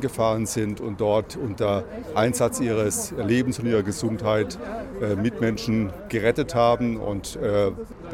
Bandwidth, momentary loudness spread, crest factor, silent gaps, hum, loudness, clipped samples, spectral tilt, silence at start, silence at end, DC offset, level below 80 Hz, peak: 16.5 kHz; 7 LU; 18 dB; none; none; -24 LUFS; under 0.1%; -5.5 dB/octave; 0 s; 0 s; under 0.1%; -46 dBFS; -6 dBFS